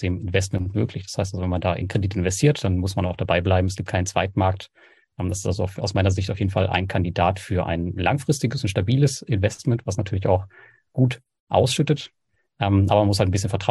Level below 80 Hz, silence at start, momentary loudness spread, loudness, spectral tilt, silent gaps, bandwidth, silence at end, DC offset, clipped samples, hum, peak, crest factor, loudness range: -44 dBFS; 0 s; 6 LU; -23 LUFS; -6 dB/octave; 11.40-11.47 s; 12.5 kHz; 0 s; under 0.1%; under 0.1%; none; -4 dBFS; 18 dB; 2 LU